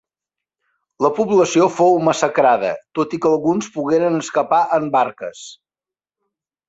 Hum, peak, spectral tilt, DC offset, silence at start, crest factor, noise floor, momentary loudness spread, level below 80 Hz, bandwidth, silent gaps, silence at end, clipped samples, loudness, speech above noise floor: none; -2 dBFS; -5 dB/octave; under 0.1%; 1 s; 16 dB; under -90 dBFS; 9 LU; -62 dBFS; 8 kHz; none; 1.15 s; under 0.1%; -17 LUFS; over 73 dB